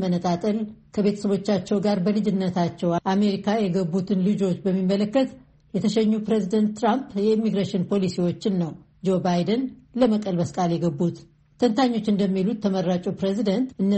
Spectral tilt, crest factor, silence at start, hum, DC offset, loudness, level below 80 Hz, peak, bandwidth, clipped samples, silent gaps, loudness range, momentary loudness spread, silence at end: -7.5 dB/octave; 16 dB; 0 s; none; under 0.1%; -23 LUFS; -60 dBFS; -6 dBFS; 8.4 kHz; under 0.1%; none; 1 LU; 4 LU; 0 s